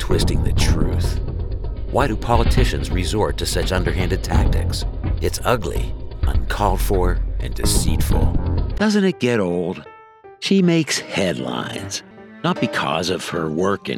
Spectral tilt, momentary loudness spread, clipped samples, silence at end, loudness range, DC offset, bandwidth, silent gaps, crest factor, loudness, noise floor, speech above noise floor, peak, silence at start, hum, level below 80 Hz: -5.5 dB/octave; 9 LU; under 0.1%; 0 s; 2 LU; under 0.1%; 17.5 kHz; none; 16 dB; -21 LUFS; -44 dBFS; 25 dB; -2 dBFS; 0 s; none; -24 dBFS